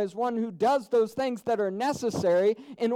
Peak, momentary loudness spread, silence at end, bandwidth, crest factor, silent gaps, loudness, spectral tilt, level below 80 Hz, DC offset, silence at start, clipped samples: -14 dBFS; 6 LU; 0 s; 15.5 kHz; 12 dB; none; -27 LUFS; -5.5 dB/octave; -66 dBFS; under 0.1%; 0 s; under 0.1%